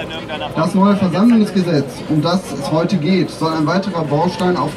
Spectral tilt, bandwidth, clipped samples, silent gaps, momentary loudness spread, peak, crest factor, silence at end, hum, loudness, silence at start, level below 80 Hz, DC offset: -7 dB/octave; 13 kHz; under 0.1%; none; 7 LU; -2 dBFS; 14 dB; 0 s; none; -16 LUFS; 0 s; -48 dBFS; under 0.1%